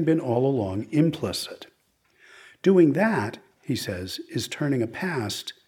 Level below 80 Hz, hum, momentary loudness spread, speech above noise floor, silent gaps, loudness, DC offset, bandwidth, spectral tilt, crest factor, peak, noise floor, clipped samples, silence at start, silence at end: -64 dBFS; none; 13 LU; 42 dB; none; -25 LUFS; under 0.1%; 18 kHz; -6 dB/octave; 18 dB; -8 dBFS; -66 dBFS; under 0.1%; 0 s; 0.15 s